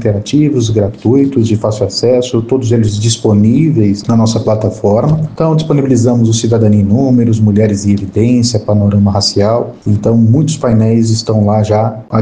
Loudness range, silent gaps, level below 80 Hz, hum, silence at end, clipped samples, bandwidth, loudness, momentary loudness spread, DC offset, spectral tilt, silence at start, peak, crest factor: 1 LU; none; -40 dBFS; none; 0 s; under 0.1%; 9.6 kHz; -11 LUFS; 4 LU; under 0.1%; -7 dB/octave; 0 s; 0 dBFS; 10 dB